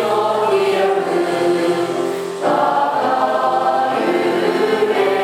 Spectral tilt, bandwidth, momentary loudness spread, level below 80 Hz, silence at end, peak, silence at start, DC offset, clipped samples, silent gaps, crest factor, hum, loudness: -5 dB/octave; 16 kHz; 3 LU; -66 dBFS; 0 s; -4 dBFS; 0 s; under 0.1%; under 0.1%; none; 14 dB; none; -17 LUFS